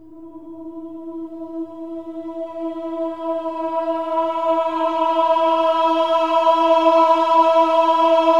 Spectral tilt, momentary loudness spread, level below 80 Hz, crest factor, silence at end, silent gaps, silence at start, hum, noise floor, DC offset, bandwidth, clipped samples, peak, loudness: -4 dB/octave; 18 LU; -66 dBFS; 16 dB; 0 s; none; 0.1 s; none; -38 dBFS; 0.4%; 8 kHz; under 0.1%; -2 dBFS; -17 LUFS